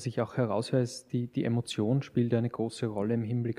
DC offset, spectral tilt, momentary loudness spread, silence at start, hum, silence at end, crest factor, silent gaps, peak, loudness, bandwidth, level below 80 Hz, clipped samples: under 0.1%; -7 dB/octave; 4 LU; 0 s; none; 0 s; 14 dB; none; -16 dBFS; -31 LUFS; 11.5 kHz; -68 dBFS; under 0.1%